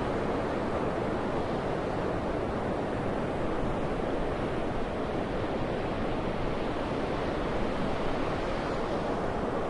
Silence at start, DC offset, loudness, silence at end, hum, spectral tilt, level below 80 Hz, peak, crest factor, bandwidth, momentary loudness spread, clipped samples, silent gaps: 0 s; under 0.1%; -32 LUFS; 0 s; none; -7 dB/octave; -40 dBFS; -18 dBFS; 12 dB; 11 kHz; 1 LU; under 0.1%; none